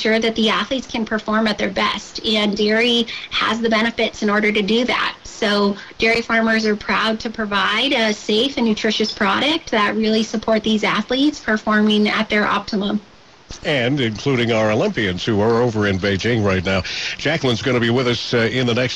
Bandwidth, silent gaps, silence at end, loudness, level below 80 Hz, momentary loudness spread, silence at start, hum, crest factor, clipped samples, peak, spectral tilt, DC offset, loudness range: 10 kHz; none; 0 s; -18 LUFS; -48 dBFS; 5 LU; 0 s; none; 12 dB; under 0.1%; -6 dBFS; -5 dB/octave; 0.2%; 1 LU